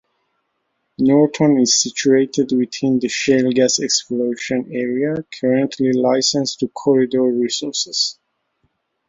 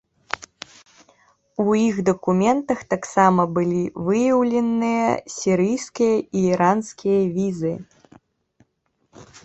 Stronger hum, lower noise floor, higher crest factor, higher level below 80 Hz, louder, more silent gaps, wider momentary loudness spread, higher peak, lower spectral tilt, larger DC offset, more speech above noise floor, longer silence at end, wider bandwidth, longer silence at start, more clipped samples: neither; about the same, -71 dBFS vs -69 dBFS; about the same, 16 dB vs 20 dB; about the same, -62 dBFS vs -58 dBFS; first, -17 LUFS vs -20 LUFS; neither; second, 7 LU vs 14 LU; about the same, -2 dBFS vs -2 dBFS; second, -3.5 dB/octave vs -6.5 dB/octave; neither; first, 54 dB vs 50 dB; first, 0.95 s vs 0.2 s; about the same, 7.8 kHz vs 8.2 kHz; first, 1 s vs 0.35 s; neither